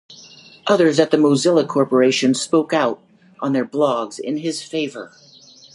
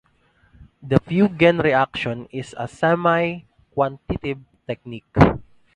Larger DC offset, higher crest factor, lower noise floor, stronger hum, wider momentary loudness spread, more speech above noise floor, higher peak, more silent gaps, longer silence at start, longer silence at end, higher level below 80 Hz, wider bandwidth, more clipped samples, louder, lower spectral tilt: neither; about the same, 18 dB vs 22 dB; second, -44 dBFS vs -60 dBFS; neither; second, 12 LU vs 16 LU; second, 27 dB vs 40 dB; about the same, 0 dBFS vs 0 dBFS; neither; second, 0.1 s vs 0.6 s; first, 0.7 s vs 0.35 s; second, -70 dBFS vs -40 dBFS; first, 11.5 kHz vs 10 kHz; neither; about the same, -18 LUFS vs -20 LUFS; second, -4.5 dB/octave vs -7.5 dB/octave